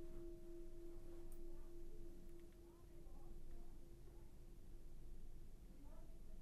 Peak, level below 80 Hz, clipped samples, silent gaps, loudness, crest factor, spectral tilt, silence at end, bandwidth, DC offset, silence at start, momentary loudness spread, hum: -40 dBFS; -54 dBFS; under 0.1%; none; -62 LUFS; 12 dB; -7 dB/octave; 0 s; 13 kHz; under 0.1%; 0 s; 6 LU; none